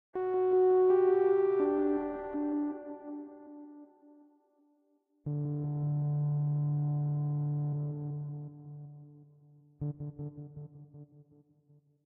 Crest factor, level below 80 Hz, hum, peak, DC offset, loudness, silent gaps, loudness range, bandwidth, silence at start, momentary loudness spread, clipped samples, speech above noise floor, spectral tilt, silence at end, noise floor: 14 dB; -68 dBFS; none; -18 dBFS; under 0.1%; -31 LUFS; none; 15 LU; 3.1 kHz; 0.15 s; 23 LU; under 0.1%; 25 dB; -13 dB/octave; 0.85 s; -73 dBFS